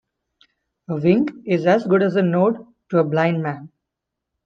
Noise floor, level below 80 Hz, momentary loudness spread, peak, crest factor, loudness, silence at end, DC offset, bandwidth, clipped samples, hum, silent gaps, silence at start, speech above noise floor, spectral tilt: -82 dBFS; -64 dBFS; 12 LU; -4 dBFS; 18 dB; -19 LUFS; 0.8 s; under 0.1%; 6.8 kHz; under 0.1%; none; none; 0.9 s; 64 dB; -8.5 dB/octave